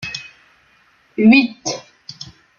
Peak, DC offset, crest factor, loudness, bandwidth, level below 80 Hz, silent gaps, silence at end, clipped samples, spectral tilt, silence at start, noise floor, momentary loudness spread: -2 dBFS; under 0.1%; 18 dB; -15 LUFS; 7.2 kHz; -58 dBFS; none; 0.35 s; under 0.1%; -4.5 dB/octave; 0 s; -55 dBFS; 24 LU